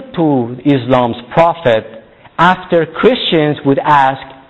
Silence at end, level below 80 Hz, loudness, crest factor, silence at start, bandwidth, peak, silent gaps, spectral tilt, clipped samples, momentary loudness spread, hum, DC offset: 0.15 s; -46 dBFS; -12 LUFS; 12 dB; 0 s; 8.2 kHz; 0 dBFS; none; -7.5 dB/octave; under 0.1%; 5 LU; none; 0.3%